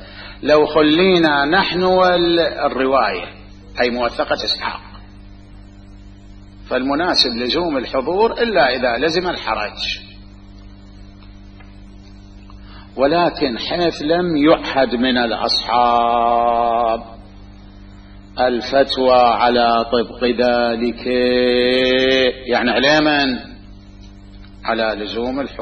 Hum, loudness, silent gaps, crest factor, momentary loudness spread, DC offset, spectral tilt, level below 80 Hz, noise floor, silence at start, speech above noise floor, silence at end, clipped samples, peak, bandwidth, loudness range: 50 Hz at -45 dBFS; -16 LUFS; none; 18 dB; 9 LU; under 0.1%; -5 dB/octave; -40 dBFS; -39 dBFS; 0 s; 23 dB; 0 s; under 0.1%; 0 dBFS; 8.8 kHz; 8 LU